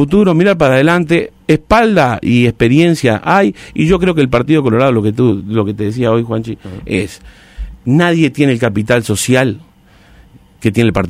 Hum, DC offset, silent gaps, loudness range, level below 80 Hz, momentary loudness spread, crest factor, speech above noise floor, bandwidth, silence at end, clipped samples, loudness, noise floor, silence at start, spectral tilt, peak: none; under 0.1%; none; 4 LU; -34 dBFS; 9 LU; 12 dB; 33 dB; 16 kHz; 0 s; under 0.1%; -12 LUFS; -44 dBFS; 0 s; -6.5 dB/octave; 0 dBFS